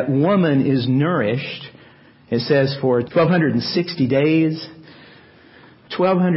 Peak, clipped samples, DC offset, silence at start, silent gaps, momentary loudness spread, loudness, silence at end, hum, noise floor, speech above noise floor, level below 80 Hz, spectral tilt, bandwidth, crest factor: -6 dBFS; under 0.1%; under 0.1%; 0 s; none; 14 LU; -18 LUFS; 0 s; none; -48 dBFS; 30 dB; -58 dBFS; -11 dB/octave; 5.8 kHz; 12 dB